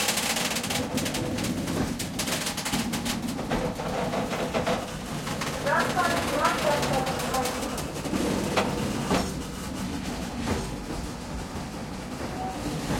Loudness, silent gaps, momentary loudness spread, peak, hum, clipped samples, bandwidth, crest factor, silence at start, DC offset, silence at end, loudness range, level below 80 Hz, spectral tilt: -28 LUFS; none; 10 LU; -10 dBFS; none; under 0.1%; 16.5 kHz; 18 dB; 0 s; under 0.1%; 0 s; 5 LU; -44 dBFS; -4 dB/octave